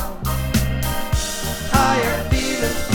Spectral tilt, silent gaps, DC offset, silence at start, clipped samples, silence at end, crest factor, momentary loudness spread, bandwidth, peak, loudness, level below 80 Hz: -4.5 dB/octave; none; under 0.1%; 0 s; under 0.1%; 0 s; 18 dB; 7 LU; over 20 kHz; -2 dBFS; -20 LUFS; -26 dBFS